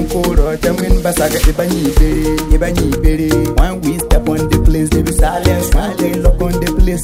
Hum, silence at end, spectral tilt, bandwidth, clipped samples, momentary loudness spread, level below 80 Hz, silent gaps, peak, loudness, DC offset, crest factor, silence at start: none; 0 s; -5.5 dB/octave; 16.5 kHz; under 0.1%; 3 LU; -14 dBFS; none; 0 dBFS; -14 LUFS; under 0.1%; 12 dB; 0 s